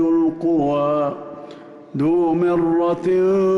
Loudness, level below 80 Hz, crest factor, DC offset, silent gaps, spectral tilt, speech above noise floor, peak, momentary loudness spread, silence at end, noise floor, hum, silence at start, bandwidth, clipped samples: -19 LUFS; -54 dBFS; 8 dB; under 0.1%; none; -9 dB/octave; 22 dB; -10 dBFS; 16 LU; 0 s; -39 dBFS; none; 0 s; 6.6 kHz; under 0.1%